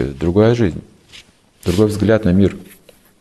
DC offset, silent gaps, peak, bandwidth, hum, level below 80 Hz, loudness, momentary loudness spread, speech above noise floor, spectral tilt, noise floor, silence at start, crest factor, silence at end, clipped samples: under 0.1%; none; -2 dBFS; 12.5 kHz; none; -40 dBFS; -15 LUFS; 13 LU; 30 dB; -7.5 dB/octave; -44 dBFS; 0 s; 14 dB; 0.6 s; under 0.1%